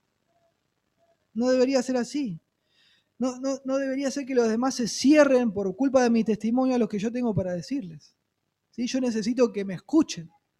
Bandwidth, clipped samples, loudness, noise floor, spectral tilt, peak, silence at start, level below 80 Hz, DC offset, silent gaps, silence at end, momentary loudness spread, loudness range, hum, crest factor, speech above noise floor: 12 kHz; under 0.1%; -25 LUFS; -78 dBFS; -5 dB/octave; -8 dBFS; 1.35 s; -62 dBFS; under 0.1%; none; 0.3 s; 12 LU; 6 LU; none; 18 dB; 54 dB